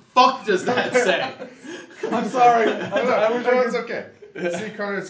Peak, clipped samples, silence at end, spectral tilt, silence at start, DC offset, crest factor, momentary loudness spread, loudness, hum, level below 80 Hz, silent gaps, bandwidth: -2 dBFS; under 0.1%; 0 s; -4 dB/octave; 0.15 s; under 0.1%; 18 dB; 17 LU; -20 LUFS; none; -74 dBFS; none; 8 kHz